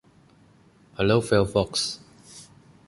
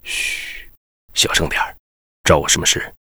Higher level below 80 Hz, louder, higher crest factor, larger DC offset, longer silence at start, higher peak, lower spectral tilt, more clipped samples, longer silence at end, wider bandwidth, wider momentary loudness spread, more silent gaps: second, -50 dBFS vs -36 dBFS; second, -23 LUFS vs -17 LUFS; about the same, 20 dB vs 20 dB; neither; first, 1 s vs 0.05 s; second, -6 dBFS vs 0 dBFS; first, -5 dB/octave vs -2 dB/octave; neither; first, 0.45 s vs 0.1 s; second, 11.5 kHz vs over 20 kHz; first, 24 LU vs 12 LU; second, none vs 0.77-1.08 s, 1.80-2.24 s